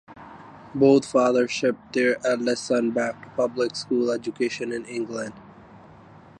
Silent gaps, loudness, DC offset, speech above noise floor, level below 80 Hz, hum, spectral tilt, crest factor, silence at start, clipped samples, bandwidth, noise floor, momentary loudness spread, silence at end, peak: none; -24 LUFS; under 0.1%; 25 dB; -64 dBFS; none; -5 dB/octave; 18 dB; 0.1 s; under 0.1%; 10.5 kHz; -48 dBFS; 16 LU; 0.6 s; -6 dBFS